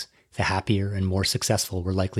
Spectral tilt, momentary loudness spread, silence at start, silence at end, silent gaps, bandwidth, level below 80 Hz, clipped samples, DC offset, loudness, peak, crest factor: -4.5 dB/octave; 4 LU; 0 s; 0 s; none; 15.5 kHz; -52 dBFS; under 0.1%; under 0.1%; -25 LUFS; -8 dBFS; 18 dB